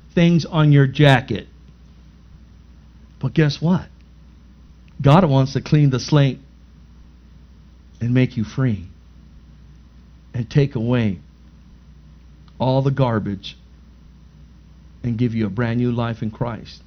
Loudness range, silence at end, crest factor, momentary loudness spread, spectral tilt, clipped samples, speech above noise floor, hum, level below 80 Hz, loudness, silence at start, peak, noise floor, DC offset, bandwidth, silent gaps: 7 LU; 0.1 s; 20 dB; 14 LU; -7.5 dB/octave; under 0.1%; 28 dB; 60 Hz at -45 dBFS; -44 dBFS; -19 LUFS; 0.15 s; 0 dBFS; -45 dBFS; under 0.1%; 6.6 kHz; none